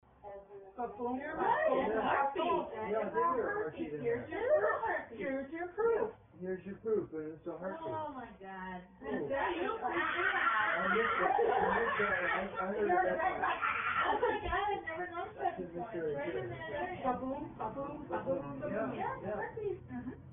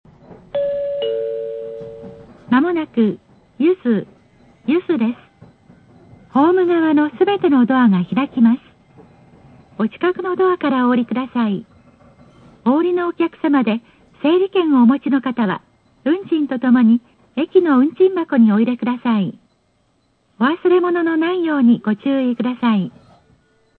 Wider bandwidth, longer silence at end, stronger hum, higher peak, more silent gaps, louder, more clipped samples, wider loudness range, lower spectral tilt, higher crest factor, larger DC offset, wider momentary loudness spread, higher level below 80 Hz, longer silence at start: second, 3.7 kHz vs 4.3 kHz; second, 0 s vs 0.9 s; neither; second, -18 dBFS vs -2 dBFS; neither; second, -35 LUFS vs -17 LUFS; neither; about the same, 7 LU vs 5 LU; second, 0 dB/octave vs -9.5 dB/octave; about the same, 18 dB vs 16 dB; neither; about the same, 12 LU vs 11 LU; about the same, -60 dBFS vs -62 dBFS; about the same, 0.25 s vs 0.3 s